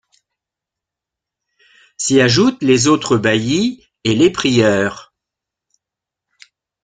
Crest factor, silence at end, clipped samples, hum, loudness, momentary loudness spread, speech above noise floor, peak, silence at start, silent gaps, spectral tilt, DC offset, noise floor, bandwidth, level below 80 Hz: 16 dB; 1.8 s; under 0.1%; none; -14 LUFS; 10 LU; 71 dB; -2 dBFS; 2 s; none; -4.5 dB/octave; under 0.1%; -85 dBFS; 9.6 kHz; -50 dBFS